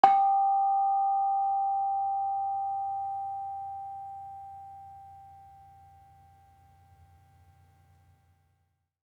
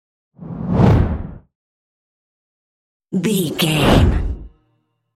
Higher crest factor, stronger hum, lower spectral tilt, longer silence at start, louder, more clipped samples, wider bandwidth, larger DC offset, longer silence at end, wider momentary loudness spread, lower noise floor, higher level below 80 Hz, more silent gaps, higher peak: first, 26 dB vs 18 dB; neither; about the same, -5 dB/octave vs -6 dB/octave; second, 0.05 s vs 0.4 s; second, -28 LUFS vs -17 LUFS; neither; second, 5.2 kHz vs 16 kHz; neither; first, 3.6 s vs 0.65 s; first, 22 LU vs 17 LU; first, -75 dBFS vs -66 dBFS; second, -76 dBFS vs -28 dBFS; second, none vs 1.55-3.00 s; second, -4 dBFS vs 0 dBFS